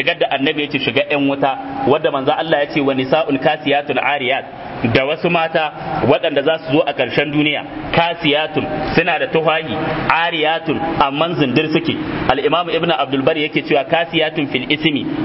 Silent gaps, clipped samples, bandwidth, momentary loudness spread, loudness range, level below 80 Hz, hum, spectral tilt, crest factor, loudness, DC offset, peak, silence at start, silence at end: none; under 0.1%; 5.8 kHz; 4 LU; 1 LU; -46 dBFS; none; -8.5 dB/octave; 16 dB; -16 LUFS; under 0.1%; 0 dBFS; 0 s; 0 s